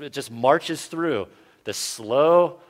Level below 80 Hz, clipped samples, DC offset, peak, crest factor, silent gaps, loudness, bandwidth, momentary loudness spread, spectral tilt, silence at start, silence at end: -68 dBFS; under 0.1%; under 0.1%; -4 dBFS; 18 dB; none; -22 LUFS; 16 kHz; 15 LU; -4 dB/octave; 0 s; 0.15 s